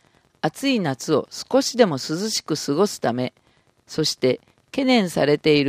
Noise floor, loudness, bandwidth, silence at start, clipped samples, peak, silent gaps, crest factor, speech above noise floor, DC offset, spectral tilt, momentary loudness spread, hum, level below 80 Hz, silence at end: -59 dBFS; -22 LUFS; 15.5 kHz; 0.45 s; under 0.1%; -2 dBFS; none; 20 dB; 38 dB; under 0.1%; -4.5 dB/octave; 9 LU; none; -62 dBFS; 0 s